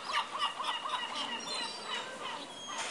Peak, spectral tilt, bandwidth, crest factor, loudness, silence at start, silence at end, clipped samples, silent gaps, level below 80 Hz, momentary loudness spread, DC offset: -20 dBFS; 0 dB/octave; 11.5 kHz; 18 dB; -36 LUFS; 0 s; 0 s; under 0.1%; none; -80 dBFS; 7 LU; under 0.1%